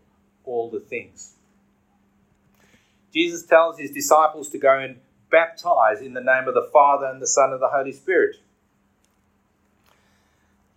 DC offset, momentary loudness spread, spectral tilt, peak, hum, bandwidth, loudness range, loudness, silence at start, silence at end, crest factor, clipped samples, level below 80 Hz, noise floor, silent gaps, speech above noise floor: under 0.1%; 13 LU; -2.5 dB/octave; -2 dBFS; none; 16 kHz; 8 LU; -20 LUFS; 0.45 s; 2.45 s; 20 dB; under 0.1%; -74 dBFS; -65 dBFS; none; 45 dB